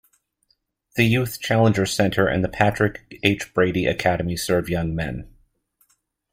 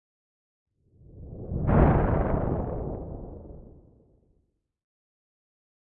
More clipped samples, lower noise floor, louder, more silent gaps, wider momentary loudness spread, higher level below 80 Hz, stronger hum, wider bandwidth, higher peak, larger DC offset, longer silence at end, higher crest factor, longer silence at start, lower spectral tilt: neither; second, -68 dBFS vs -72 dBFS; first, -21 LUFS vs -26 LUFS; neither; second, 7 LU vs 24 LU; second, -46 dBFS vs -36 dBFS; neither; first, 16 kHz vs 3.6 kHz; first, -2 dBFS vs -8 dBFS; neither; second, 1.05 s vs 2.3 s; about the same, 20 dB vs 22 dB; second, 0.95 s vs 1.15 s; second, -5.5 dB/octave vs -13 dB/octave